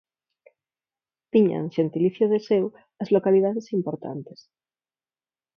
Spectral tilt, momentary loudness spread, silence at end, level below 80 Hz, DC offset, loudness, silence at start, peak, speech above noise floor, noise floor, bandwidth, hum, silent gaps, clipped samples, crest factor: -9 dB/octave; 13 LU; 1.35 s; -72 dBFS; under 0.1%; -23 LUFS; 1.35 s; -6 dBFS; over 67 dB; under -90 dBFS; 6.8 kHz; none; none; under 0.1%; 18 dB